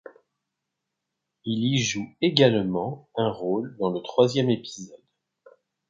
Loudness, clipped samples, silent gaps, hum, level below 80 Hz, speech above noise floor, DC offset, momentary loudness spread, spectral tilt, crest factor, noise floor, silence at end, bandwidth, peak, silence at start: -24 LUFS; under 0.1%; none; none; -64 dBFS; 59 dB; under 0.1%; 14 LU; -5 dB/octave; 26 dB; -83 dBFS; 0.95 s; 7.6 kHz; -2 dBFS; 1.45 s